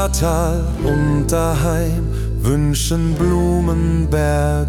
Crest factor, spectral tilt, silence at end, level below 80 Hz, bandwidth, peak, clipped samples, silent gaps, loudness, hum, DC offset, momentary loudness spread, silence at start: 12 dB; -6 dB/octave; 0 s; -22 dBFS; 17.5 kHz; -4 dBFS; under 0.1%; none; -17 LUFS; none; under 0.1%; 3 LU; 0 s